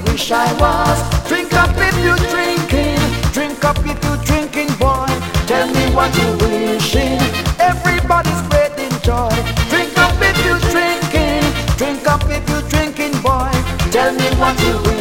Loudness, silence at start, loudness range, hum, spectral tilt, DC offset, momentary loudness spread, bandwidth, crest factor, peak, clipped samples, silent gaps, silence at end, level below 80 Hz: -15 LUFS; 0 s; 2 LU; none; -5 dB/octave; under 0.1%; 4 LU; 17 kHz; 14 dB; 0 dBFS; under 0.1%; none; 0 s; -24 dBFS